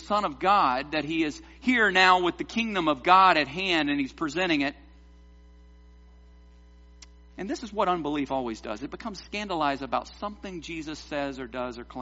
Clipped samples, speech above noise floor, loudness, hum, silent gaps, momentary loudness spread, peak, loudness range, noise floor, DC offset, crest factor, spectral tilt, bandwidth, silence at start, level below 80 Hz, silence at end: under 0.1%; 26 dB; -26 LUFS; none; none; 17 LU; -4 dBFS; 11 LU; -52 dBFS; under 0.1%; 22 dB; -2 dB/octave; 8 kHz; 0 s; -52 dBFS; 0 s